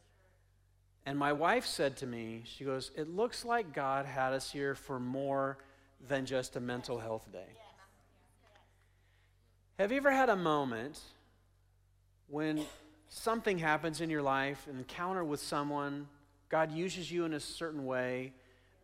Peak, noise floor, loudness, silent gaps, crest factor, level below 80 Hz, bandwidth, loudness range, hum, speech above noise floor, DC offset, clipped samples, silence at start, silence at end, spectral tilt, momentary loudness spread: -16 dBFS; -69 dBFS; -36 LUFS; none; 20 dB; -68 dBFS; 16 kHz; 6 LU; none; 34 dB; under 0.1%; under 0.1%; 1.05 s; 0.5 s; -5 dB/octave; 14 LU